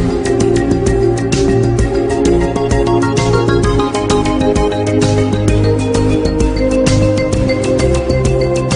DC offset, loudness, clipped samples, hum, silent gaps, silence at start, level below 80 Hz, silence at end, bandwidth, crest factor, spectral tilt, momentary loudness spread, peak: under 0.1%; -13 LUFS; under 0.1%; none; none; 0 s; -22 dBFS; 0 s; 10.5 kHz; 12 dB; -6.5 dB/octave; 2 LU; 0 dBFS